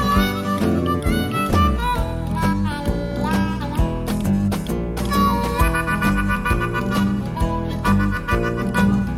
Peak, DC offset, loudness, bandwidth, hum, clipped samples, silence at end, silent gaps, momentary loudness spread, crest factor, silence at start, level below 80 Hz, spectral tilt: -4 dBFS; under 0.1%; -21 LUFS; 16.5 kHz; none; under 0.1%; 0 s; none; 5 LU; 14 dB; 0 s; -28 dBFS; -6.5 dB/octave